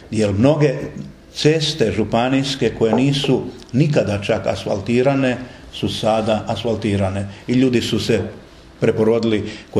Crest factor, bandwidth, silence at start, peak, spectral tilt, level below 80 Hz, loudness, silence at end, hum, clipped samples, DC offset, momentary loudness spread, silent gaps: 18 dB; 12.5 kHz; 0.05 s; 0 dBFS; -6 dB/octave; -46 dBFS; -18 LUFS; 0 s; none; under 0.1%; under 0.1%; 8 LU; none